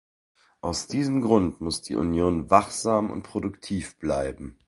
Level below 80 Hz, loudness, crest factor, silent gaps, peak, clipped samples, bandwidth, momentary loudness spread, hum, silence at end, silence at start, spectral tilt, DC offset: -46 dBFS; -26 LUFS; 24 dB; none; -2 dBFS; under 0.1%; 11.5 kHz; 11 LU; none; 0.15 s; 0.65 s; -5.5 dB/octave; under 0.1%